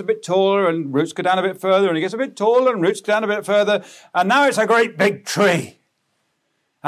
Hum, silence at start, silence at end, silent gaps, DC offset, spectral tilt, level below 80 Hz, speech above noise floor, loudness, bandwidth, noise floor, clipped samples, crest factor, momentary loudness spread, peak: none; 0 s; 0 s; none; under 0.1%; -4.5 dB/octave; -72 dBFS; 52 dB; -18 LUFS; 15.5 kHz; -70 dBFS; under 0.1%; 14 dB; 6 LU; -4 dBFS